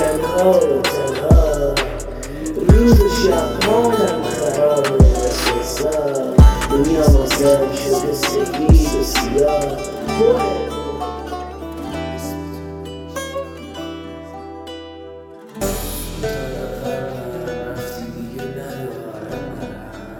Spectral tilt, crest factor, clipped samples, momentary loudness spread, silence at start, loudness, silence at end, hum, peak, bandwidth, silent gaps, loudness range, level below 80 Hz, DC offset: -5.5 dB/octave; 16 dB; under 0.1%; 17 LU; 0 s; -17 LUFS; 0 s; none; 0 dBFS; 17.5 kHz; none; 13 LU; -22 dBFS; under 0.1%